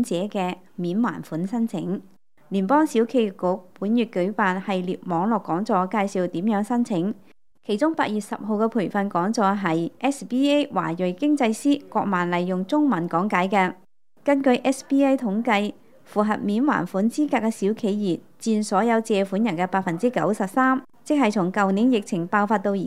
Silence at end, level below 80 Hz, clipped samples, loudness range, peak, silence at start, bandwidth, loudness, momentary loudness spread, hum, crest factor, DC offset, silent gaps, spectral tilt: 0 s; -72 dBFS; under 0.1%; 2 LU; -4 dBFS; 0 s; 14 kHz; -23 LUFS; 7 LU; none; 18 dB; 0.3%; none; -6 dB/octave